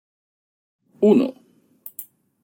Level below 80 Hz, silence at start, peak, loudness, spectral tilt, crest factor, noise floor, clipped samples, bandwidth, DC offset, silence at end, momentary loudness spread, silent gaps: -70 dBFS; 1 s; -4 dBFS; -19 LUFS; -7.5 dB/octave; 20 dB; -46 dBFS; under 0.1%; 17 kHz; under 0.1%; 0.4 s; 21 LU; none